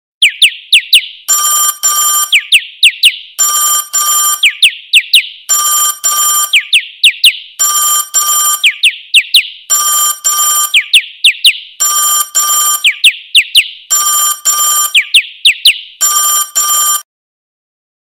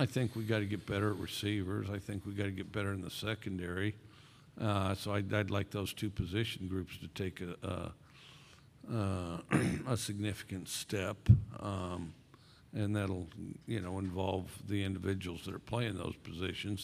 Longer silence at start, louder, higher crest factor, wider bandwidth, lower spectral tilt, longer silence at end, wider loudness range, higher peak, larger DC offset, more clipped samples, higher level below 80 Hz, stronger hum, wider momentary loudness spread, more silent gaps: first, 0.2 s vs 0 s; first, -7 LUFS vs -37 LUFS; second, 10 dB vs 26 dB; first, over 20 kHz vs 15.5 kHz; second, 6.5 dB/octave vs -6 dB/octave; first, 1 s vs 0 s; second, 1 LU vs 5 LU; first, 0 dBFS vs -12 dBFS; neither; first, 2% vs under 0.1%; second, -64 dBFS vs -54 dBFS; neither; second, 4 LU vs 9 LU; neither